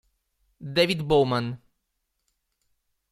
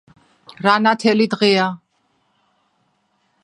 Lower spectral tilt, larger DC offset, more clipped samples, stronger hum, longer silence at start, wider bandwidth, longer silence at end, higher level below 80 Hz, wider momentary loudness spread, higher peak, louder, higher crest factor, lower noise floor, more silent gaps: about the same, -6 dB/octave vs -5 dB/octave; neither; neither; neither; about the same, 0.6 s vs 0.6 s; first, 15 kHz vs 11 kHz; second, 1.55 s vs 1.7 s; first, -54 dBFS vs -68 dBFS; first, 19 LU vs 8 LU; second, -8 dBFS vs 0 dBFS; second, -24 LUFS vs -16 LUFS; about the same, 22 dB vs 20 dB; first, -78 dBFS vs -65 dBFS; neither